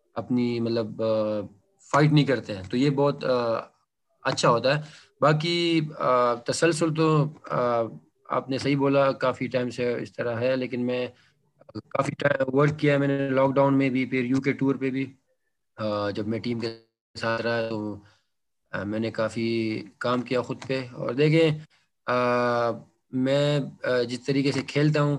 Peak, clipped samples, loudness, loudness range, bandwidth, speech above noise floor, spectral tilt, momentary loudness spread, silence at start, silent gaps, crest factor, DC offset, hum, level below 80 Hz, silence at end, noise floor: -8 dBFS; under 0.1%; -25 LUFS; 6 LU; 11 kHz; 55 dB; -6.5 dB/octave; 10 LU; 0.15 s; 17.01-17.14 s; 18 dB; under 0.1%; none; -64 dBFS; 0 s; -80 dBFS